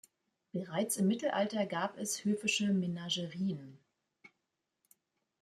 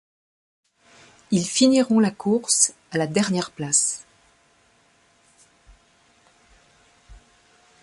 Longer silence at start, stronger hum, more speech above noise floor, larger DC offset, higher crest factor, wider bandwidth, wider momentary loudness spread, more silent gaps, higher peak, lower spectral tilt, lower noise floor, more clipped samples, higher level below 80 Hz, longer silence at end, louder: second, 0.55 s vs 1.3 s; neither; first, 51 dB vs 40 dB; neither; about the same, 18 dB vs 22 dB; first, 14.5 kHz vs 11.5 kHz; about the same, 7 LU vs 8 LU; neither; second, -18 dBFS vs -2 dBFS; about the same, -4.5 dB/octave vs -3.5 dB/octave; first, -86 dBFS vs -60 dBFS; neither; second, -80 dBFS vs -60 dBFS; first, 1.15 s vs 0.65 s; second, -35 LUFS vs -20 LUFS